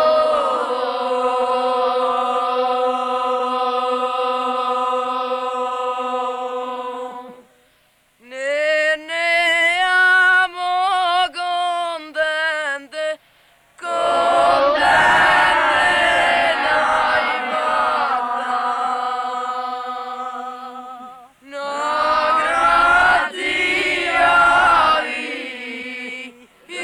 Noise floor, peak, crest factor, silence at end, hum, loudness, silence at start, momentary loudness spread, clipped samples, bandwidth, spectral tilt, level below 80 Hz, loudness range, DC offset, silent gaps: -59 dBFS; -6 dBFS; 14 dB; 0 s; none; -17 LUFS; 0 s; 15 LU; under 0.1%; 13.5 kHz; -2 dB/octave; -50 dBFS; 9 LU; under 0.1%; none